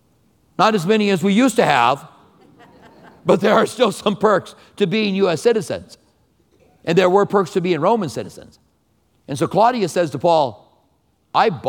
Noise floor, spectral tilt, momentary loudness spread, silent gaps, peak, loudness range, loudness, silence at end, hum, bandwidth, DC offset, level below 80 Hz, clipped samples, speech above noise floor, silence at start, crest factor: -62 dBFS; -5.5 dB/octave; 11 LU; none; 0 dBFS; 2 LU; -17 LUFS; 0 s; none; 18 kHz; under 0.1%; -60 dBFS; under 0.1%; 45 dB; 0.6 s; 18 dB